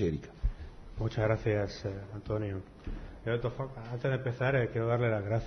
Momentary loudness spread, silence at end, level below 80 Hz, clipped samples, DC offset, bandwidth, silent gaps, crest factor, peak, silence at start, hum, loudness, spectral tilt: 13 LU; 0 s; -44 dBFS; under 0.1%; under 0.1%; 6.6 kHz; none; 16 dB; -16 dBFS; 0 s; none; -33 LUFS; -8 dB/octave